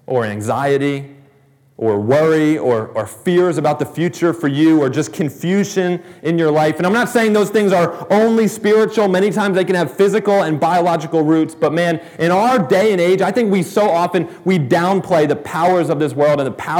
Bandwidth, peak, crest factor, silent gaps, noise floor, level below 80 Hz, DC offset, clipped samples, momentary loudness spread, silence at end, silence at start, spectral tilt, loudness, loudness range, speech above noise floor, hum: 19 kHz; -2 dBFS; 14 dB; none; -52 dBFS; -64 dBFS; under 0.1%; under 0.1%; 6 LU; 0 s; 0.1 s; -6 dB/octave; -15 LUFS; 2 LU; 37 dB; none